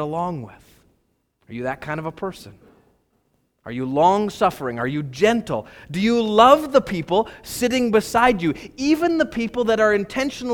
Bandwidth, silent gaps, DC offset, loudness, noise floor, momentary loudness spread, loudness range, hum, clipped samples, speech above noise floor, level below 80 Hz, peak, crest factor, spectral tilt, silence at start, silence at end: 19 kHz; none; under 0.1%; -20 LUFS; -67 dBFS; 13 LU; 13 LU; none; under 0.1%; 47 dB; -50 dBFS; 0 dBFS; 20 dB; -5 dB/octave; 0 s; 0 s